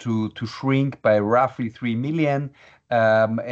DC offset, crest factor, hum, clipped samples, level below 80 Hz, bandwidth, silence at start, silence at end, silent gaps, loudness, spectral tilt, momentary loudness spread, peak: under 0.1%; 16 dB; none; under 0.1%; -64 dBFS; 7.8 kHz; 0 s; 0 s; none; -22 LUFS; -8 dB/octave; 9 LU; -6 dBFS